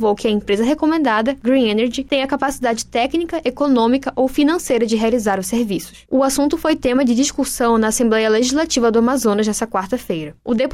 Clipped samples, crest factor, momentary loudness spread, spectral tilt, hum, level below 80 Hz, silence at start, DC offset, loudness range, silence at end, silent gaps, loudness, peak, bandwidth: under 0.1%; 10 dB; 6 LU; -4 dB/octave; none; -44 dBFS; 0 s; under 0.1%; 2 LU; 0 s; none; -17 LUFS; -6 dBFS; 16 kHz